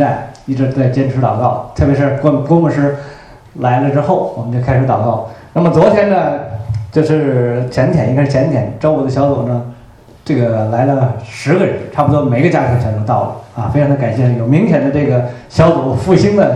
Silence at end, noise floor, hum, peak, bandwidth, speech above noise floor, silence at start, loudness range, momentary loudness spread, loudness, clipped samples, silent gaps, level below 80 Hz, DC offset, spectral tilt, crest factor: 0 s; -39 dBFS; none; 0 dBFS; 9.4 kHz; 27 dB; 0 s; 2 LU; 8 LU; -13 LUFS; under 0.1%; none; -38 dBFS; under 0.1%; -8.5 dB/octave; 12 dB